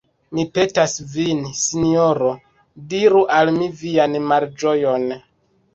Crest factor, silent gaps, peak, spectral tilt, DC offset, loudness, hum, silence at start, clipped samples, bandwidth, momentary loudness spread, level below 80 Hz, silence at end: 16 dB; none; -2 dBFS; -4.5 dB/octave; under 0.1%; -18 LUFS; none; 0.3 s; under 0.1%; 8.2 kHz; 10 LU; -54 dBFS; 0.55 s